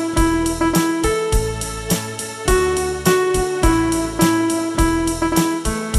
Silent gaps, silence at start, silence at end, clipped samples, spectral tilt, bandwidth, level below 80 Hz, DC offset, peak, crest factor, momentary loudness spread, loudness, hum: none; 0 s; 0 s; under 0.1%; -4.5 dB/octave; 15.5 kHz; -26 dBFS; under 0.1%; -2 dBFS; 16 dB; 5 LU; -18 LUFS; none